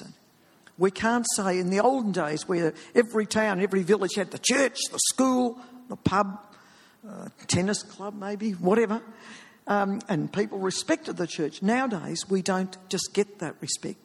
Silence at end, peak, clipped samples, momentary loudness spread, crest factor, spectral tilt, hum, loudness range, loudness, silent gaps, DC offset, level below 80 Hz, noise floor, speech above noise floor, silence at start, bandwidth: 0.1 s; -6 dBFS; under 0.1%; 12 LU; 22 dB; -4 dB/octave; none; 4 LU; -26 LUFS; none; under 0.1%; -62 dBFS; -59 dBFS; 33 dB; 0 s; 13.5 kHz